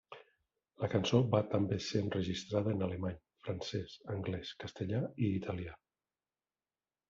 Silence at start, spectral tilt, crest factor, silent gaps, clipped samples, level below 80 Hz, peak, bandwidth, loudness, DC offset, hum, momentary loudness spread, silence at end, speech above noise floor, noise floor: 0.1 s; -6 dB/octave; 22 dB; none; under 0.1%; -66 dBFS; -16 dBFS; 7.6 kHz; -36 LUFS; under 0.1%; none; 13 LU; 1.35 s; over 55 dB; under -90 dBFS